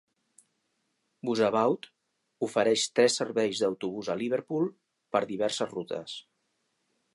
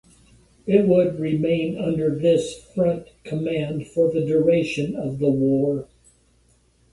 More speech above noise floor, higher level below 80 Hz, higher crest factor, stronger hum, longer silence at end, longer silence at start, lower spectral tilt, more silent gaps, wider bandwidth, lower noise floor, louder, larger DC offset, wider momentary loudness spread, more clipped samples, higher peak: first, 49 dB vs 39 dB; second, -76 dBFS vs -54 dBFS; about the same, 20 dB vs 18 dB; neither; second, 0.95 s vs 1.1 s; first, 1.25 s vs 0.65 s; second, -3.5 dB/octave vs -7.5 dB/octave; neither; about the same, 11.5 kHz vs 11.5 kHz; first, -77 dBFS vs -60 dBFS; second, -29 LUFS vs -22 LUFS; neither; about the same, 11 LU vs 9 LU; neither; second, -10 dBFS vs -4 dBFS